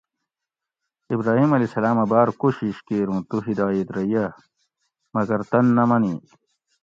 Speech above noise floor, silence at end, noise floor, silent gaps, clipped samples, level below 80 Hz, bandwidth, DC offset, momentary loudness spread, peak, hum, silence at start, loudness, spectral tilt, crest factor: 66 dB; 0.65 s; -87 dBFS; none; under 0.1%; -60 dBFS; 7.4 kHz; under 0.1%; 9 LU; -4 dBFS; none; 1.1 s; -21 LUFS; -9.5 dB/octave; 18 dB